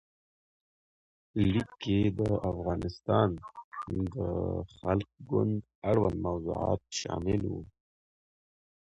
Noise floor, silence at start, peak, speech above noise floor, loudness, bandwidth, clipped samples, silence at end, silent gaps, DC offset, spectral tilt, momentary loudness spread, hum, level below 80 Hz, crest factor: under -90 dBFS; 1.35 s; -14 dBFS; over 59 dB; -31 LUFS; 8.2 kHz; under 0.1%; 1.15 s; 3.64-3.71 s, 5.75-5.82 s; under 0.1%; -7 dB/octave; 9 LU; none; -48 dBFS; 18 dB